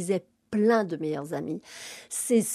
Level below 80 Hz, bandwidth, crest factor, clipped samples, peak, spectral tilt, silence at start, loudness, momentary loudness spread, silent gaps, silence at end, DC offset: -74 dBFS; 14.5 kHz; 16 dB; under 0.1%; -10 dBFS; -5 dB/octave; 0 s; -28 LUFS; 13 LU; none; 0 s; under 0.1%